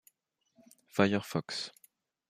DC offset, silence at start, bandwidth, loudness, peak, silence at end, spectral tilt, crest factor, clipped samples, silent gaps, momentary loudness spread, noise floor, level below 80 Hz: under 0.1%; 0.95 s; 15.5 kHz; -33 LUFS; -12 dBFS; 0.6 s; -5.5 dB/octave; 24 dB; under 0.1%; none; 10 LU; -77 dBFS; -78 dBFS